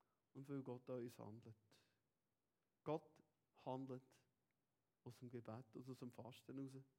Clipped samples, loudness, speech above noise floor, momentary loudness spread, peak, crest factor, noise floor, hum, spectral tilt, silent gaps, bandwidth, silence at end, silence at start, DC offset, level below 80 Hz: under 0.1%; -55 LUFS; over 36 dB; 13 LU; -34 dBFS; 24 dB; under -90 dBFS; none; -7.5 dB/octave; none; 16.5 kHz; 0.15 s; 0.35 s; under 0.1%; under -90 dBFS